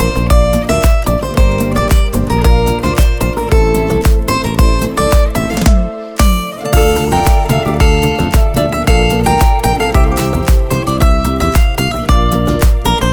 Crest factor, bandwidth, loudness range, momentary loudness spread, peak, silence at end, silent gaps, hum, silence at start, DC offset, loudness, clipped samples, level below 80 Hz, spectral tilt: 10 dB; 20 kHz; 1 LU; 3 LU; 0 dBFS; 0 s; none; none; 0 s; 0.2%; -12 LUFS; under 0.1%; -14 dBFS; -5.5 dB/octave